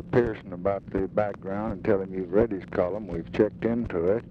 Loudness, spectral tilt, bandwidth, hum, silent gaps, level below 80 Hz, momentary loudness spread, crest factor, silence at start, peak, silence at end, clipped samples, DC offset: -28 LUFS; -9.5 dB/octave; 6.6 kHz; none; none; -48 dBFS; 6 LU; 18 dB; 0 s; -8 dBFS; 0 s; under 0.1%; under 0.1%